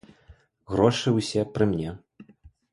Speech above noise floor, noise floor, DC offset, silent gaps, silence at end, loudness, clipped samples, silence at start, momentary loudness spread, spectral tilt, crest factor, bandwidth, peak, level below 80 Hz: 32 dB; -56 dBFS; under 0.1%; none; 0.25 s; -25 LUFS; under 0.1%; 0.3 s; 12 LU; -6 dB/octave; 22 dB; 11.5 kHz; -4 dBFS; -50 dBFS